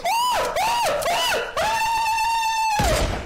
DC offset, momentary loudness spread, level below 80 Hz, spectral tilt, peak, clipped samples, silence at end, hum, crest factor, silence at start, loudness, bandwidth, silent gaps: under 0.1%; 1 LU; -34 dBFS; -2.5 dB/octave; -8 dBFS; under 0.1%; 0 s; none; 14 dB; 0 s; -21 LUFS; 16.5 kHz; none